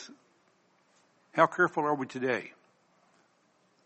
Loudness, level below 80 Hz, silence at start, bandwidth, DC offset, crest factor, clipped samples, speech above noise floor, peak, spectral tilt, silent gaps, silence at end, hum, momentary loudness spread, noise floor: -29 LUFS; -82 dBFS; 0 s; 8.4 kHz; under 0.1%; 26 dB; under 0.1%; 41 dB; -8 dBFS; -5.5 dB/octave; none; 1.35 s; none; 18 LU; -69 dBFS